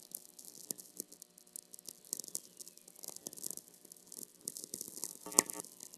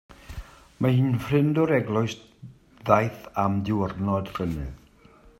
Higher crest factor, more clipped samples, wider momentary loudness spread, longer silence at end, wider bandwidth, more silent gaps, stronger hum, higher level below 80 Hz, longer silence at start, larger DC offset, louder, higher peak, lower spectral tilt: first, 44 dB vs 24 dB; neither; first, 21 LU vs 18 LU; second, 0 s vs 0.65 s; about the same, 16 kHz vs 15.5 kHz; neither; neither; second, -88 dBFS vs -48 dBFS; about the same, 0 s vs 0.1 s; neither; second, -40 LUFS vs -25 LUFS; about the same, -2 dBFS vs -2 dBFS; second, -0.5 dB/octave vs -8 dB/octave